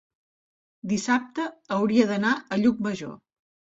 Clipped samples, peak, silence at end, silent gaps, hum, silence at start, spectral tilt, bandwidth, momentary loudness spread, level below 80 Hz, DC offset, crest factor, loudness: under 0.1%; -6 dBFS; 0.6 s; none; none; 0.85 s; -5.5 dB/octave; 8 kHz; 12 LU; -64 dBFS; under 0.1%; 20 dB; -25 LUFS